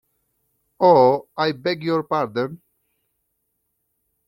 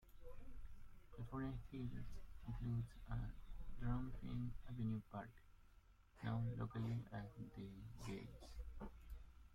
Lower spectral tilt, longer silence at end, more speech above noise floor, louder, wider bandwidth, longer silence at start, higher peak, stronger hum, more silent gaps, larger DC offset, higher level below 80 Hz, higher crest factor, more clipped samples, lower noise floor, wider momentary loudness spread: about the same, -7.5 dB/octave vs -8 dB/octave; first, 1.7 s vs 0 s; first, 55 dB vs 21 dB; first, -19 LUFS vs -50 LUFS; second, 6.2 kHz vs 13.5 kHz; first, 0.8 s vs 0 s; first, -2 dBFS vs -30 dBFS; neither; neither; neither; second, -66 dBFS vs -56 dBFS; about the same, 20 dB vs 18 dB; neither; first, -74 dBFS vs -69 dBFS; second, 11 LU vs 15 LU